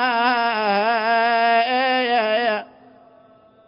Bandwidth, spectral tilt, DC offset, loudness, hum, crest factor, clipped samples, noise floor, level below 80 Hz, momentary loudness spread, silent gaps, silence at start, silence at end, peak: 5.4 kHz; -7.5 dB/octave; under 0.1%; -19 LUFS; none; 12 dB; under 0.1%; -51 dBFS; -72 dBFS; 3 LU; none; 0 s; 1.05 s; -8 dBFS